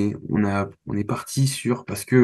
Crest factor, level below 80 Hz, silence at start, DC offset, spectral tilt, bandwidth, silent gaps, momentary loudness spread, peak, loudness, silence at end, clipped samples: 18 dB; -54 dBFS; 0 s; under 0.1%; -6 dB/octave; 12.5 kHz; none; 5 LU; -4 dBFS; -24 LUFS; 0 s; under 0.1%